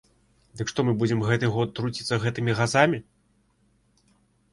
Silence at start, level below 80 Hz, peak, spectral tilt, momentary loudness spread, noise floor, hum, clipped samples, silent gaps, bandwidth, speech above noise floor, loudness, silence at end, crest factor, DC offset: 0.55 s; -58 dBFS; -4 dBFS; -5.5 dB/octave; 9 LU; -66 dBFS; none; under 0.1%; none; 11.5 kHz; 42 dB; -25 LUFS; 1.5 s; 22 dB; under 0.1%